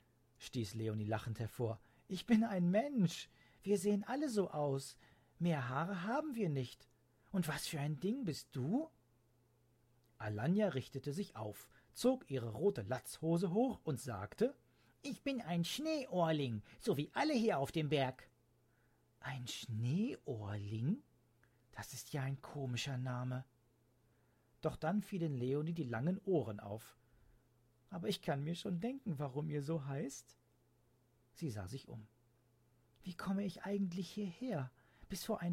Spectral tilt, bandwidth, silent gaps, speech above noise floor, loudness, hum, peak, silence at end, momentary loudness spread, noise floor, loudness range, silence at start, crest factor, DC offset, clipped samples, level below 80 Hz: -6 dB/octave; 16 kHz; none; 35 dB; -40 LUFS; none; -20 dBFS; 0 s; 13 LU; -74 dBFS; 7 LU; 0.4 s; 20 dB; under 0.1%; under 0.1%; -72 dBFS